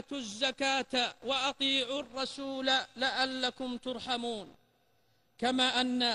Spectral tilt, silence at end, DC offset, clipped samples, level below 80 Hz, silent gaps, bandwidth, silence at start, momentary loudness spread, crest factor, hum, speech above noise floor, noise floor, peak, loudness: -2 dB/octave; 0 s; under 0.1%; under 0.1%; -68 dBFS; none; 11.5 kHz; 0.1 s; 9 LU; 16 dB; none; 40 dB; -72 dBFS; -16 dBFS; -31 LUFS